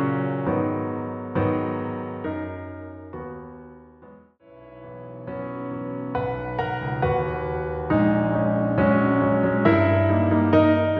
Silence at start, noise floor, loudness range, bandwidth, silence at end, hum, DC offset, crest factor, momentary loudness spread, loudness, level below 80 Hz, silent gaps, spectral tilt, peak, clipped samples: 0 s; -49 dBFS; 16 LU; 5.2 kHz; 0 s; none; under 0.1%; 20 dB; 19 LU; -23 LUFS; -46 dBFS; none; -10.5 dB/octave; -4 dBFS; under 0.1%